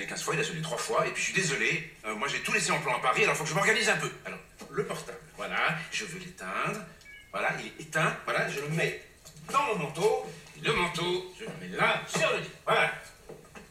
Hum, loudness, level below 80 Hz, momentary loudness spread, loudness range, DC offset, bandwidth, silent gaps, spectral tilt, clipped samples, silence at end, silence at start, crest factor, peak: none; -29 LUFS; -60 dBFS; 16 LU; 6 LU; under 0.1%; 16 kHz; none; -3 dB/octave; under 0.1%; 0 s; 0 s; 20 dB; -12 dBFS